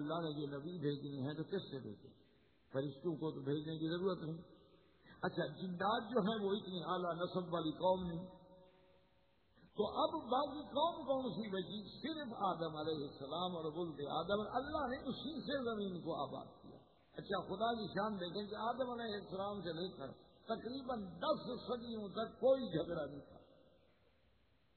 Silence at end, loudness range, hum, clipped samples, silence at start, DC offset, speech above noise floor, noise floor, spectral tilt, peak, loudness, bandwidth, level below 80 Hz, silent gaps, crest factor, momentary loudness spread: 1.25 s; 4 LU; none; under 0.1%; 0 s; under 0.1%; 34 dB; -75 dBFS; -4.5 dB/octave; -24 dBFS; -42 LUFS; 4.5 kHz; -70 dBFS; none; 18 dB; 9 LU